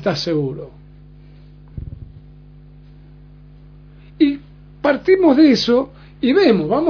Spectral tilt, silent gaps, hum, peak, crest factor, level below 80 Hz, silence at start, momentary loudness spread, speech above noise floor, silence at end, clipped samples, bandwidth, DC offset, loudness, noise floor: -6.5 dB/octave; none; 50 Hz at -40 dBFS; -2 dBFS; 18 dB; -44 dBFS; 0 s; 23 LU; 27 dB; 0 s; under 0.1%; 5.4 kHz; under 0.1%; -16 LUFS; -42 dBFS